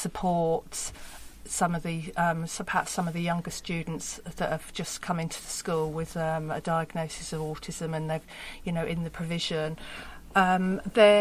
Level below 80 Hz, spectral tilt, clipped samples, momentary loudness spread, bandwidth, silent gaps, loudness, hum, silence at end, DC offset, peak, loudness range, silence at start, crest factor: -52 dBFS; -4.5 dB/octave; under 0.1%; 10 LU; 15.5 kHz; none; -30 LUFS; none; 0 s; under 0.1%; -6 dBFS; 3 LU; 0 s; 22 dB